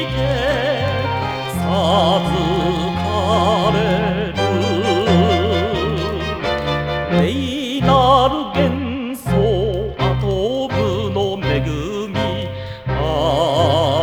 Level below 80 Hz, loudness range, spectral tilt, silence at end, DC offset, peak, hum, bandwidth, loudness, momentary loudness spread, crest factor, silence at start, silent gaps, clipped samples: -32 dBFS; 3 LU; -6.5 dB/octave; 0 s; under 0.1%; -2 dBFS; none; 19.5 kHz; -18 LUFS; 7 LU; 16 dB; 0 s; none; under 0.1%